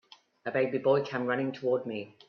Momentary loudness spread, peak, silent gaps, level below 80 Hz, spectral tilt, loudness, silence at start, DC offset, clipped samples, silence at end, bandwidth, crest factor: 8 LU; -14 dBFS; none; -74 dBFS; -7.5 dB/octave; -30 LUFS; 0.45 s; under 0.1%; under 0.1%; 0.2 s; 6.6 kHz; 18 dB